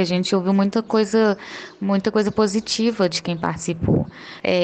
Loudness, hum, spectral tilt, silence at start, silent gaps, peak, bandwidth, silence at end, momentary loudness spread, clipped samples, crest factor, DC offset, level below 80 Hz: -21 LUFS; none; -5.5 dB/octave; 0 s; none; -6 dBFS; 9 kHz; 0 s; 8 LU; under 0.1%; 14 dB; under 0.1%; -48 dBFS